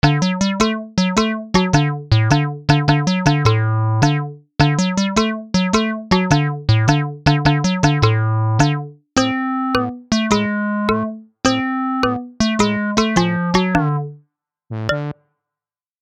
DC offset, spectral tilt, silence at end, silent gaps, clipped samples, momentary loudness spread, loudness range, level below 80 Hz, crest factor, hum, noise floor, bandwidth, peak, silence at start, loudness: under 0.1%; -5.5 dB/octave; 0.9 s; none; under 0.1%; 6 LU; 3 LU; -38 dBFS; 16 dB; none; -89 dBFS; 10 kHz; 0 dBFS; 0.05 s; -17 LUFS